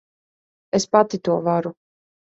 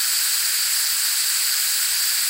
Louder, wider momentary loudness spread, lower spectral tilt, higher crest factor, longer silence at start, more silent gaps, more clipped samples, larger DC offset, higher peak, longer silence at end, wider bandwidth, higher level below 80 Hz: about the same, -20 LUFS vs -18 LUFS; first, 7 LU vs 0 LU; first, -5.5 dB/octave vs 6 dB/octave; first, 20 dB vs 14 dB; first, 0.75 s vs 0 s; neither; neither; neither; first, -2 dBFS vs -8 dBFS; first, 0.6 s vs 0 s; second, 8 kHz vs 16 kHz; about the same, -64 dBFS vs -66 dBFS